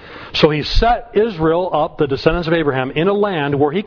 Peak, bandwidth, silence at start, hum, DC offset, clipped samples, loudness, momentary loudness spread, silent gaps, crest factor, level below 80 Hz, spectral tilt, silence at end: 0 dBFS; 5.4 kHz; 0 s; none; under 0.1%; under 0.1%; -16 LUFS; 3 LU; none; 16 dB; -28 dBFS; -7 dB/octave; 0 s